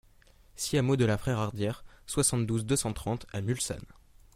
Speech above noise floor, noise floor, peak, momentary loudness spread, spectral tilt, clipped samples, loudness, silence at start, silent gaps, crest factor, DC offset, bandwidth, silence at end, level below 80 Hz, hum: 29 dB; -59 dBFS; -12 dBFS; 8 LU; -5 dB/octave; under 0.1%; -30 LUFS; 0.55 s; none; 18 dB; under 0.1%; 16 kHz; 0.5 s; -52 dBFS; none